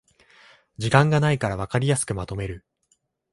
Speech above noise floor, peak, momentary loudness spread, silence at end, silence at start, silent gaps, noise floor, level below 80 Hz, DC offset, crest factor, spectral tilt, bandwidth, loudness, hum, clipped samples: 47 dB; 0 dBFS; 14 LU; 0.75 s; 0.8 s; none; -69 dBFS; -48 dBFS; under 0.1%; 24 dB; -5.5 dB/octave; 11.5 kHz; -23 LUFS; none; under 0.1%